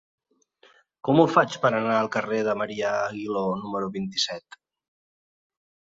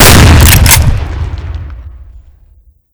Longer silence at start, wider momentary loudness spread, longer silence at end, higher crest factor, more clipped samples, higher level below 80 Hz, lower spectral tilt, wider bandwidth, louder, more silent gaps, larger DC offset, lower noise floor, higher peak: first, 1.05 s vs 0 s; second, 9 LU vs 20 LU; first, 1.55 s vs 0.9 s; first, 22 dB vs 6 dB; second, under 0.1% vs 20%; second, -66 dBFS vs -12 dBFS; first, -5 dB/octave vs -3.5 dB/octave; second, 7.8 kHz vs over 20 kHz; second, -24 LUFS vs -5 LUFS; neither; neither; first, -61 dBFS vs -43 dBFS; second, -4 dBFS vs 0 dBFS